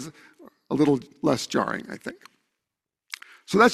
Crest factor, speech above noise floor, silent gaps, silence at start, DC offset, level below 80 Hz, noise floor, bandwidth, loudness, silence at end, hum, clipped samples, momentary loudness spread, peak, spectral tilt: 22 dB; 60 dB; none; 0 s; under 0.1%; -64 dBFS; -86 dBFS; 14 kHz; -25 LUFS; 0 s; none; under 0.1%; 17 LU; -4 dBFS; -5 dB/octave